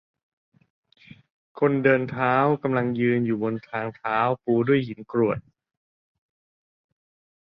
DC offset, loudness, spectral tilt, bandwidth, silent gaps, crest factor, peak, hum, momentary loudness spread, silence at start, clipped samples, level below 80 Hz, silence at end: under 0.1%; -24 LUFS; -10 dB/octave; 5.4 kHz; none; 22 dB; -4 dBFS; none; 8 LU; 1.55 s; under 0.1%; -64 dBFS; 2.05 s